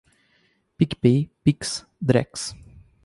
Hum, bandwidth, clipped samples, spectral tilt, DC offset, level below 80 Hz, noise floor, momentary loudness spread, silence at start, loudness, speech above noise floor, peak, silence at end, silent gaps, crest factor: none; 11.5 kHz; under 0.1%; -6 dB/octave; under 0.1%; -52 dBFS; -65 dBFS; 11 LU; 0.8 s; -23 LUFS; 43 dB; -4 dBFS; 0.5 s; none; 20 dB